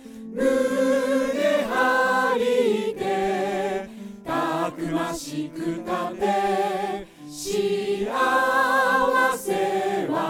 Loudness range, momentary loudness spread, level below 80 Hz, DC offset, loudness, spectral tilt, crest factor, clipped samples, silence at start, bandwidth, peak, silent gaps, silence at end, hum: 5 LU; 10 LU; -56 dBFS; under 0.1%; -23 LUFS; -4 dB/octave; 16 dB; under 0.1%; 0 s; 18.5 kHz; -8 dBFS; none; 0 s; none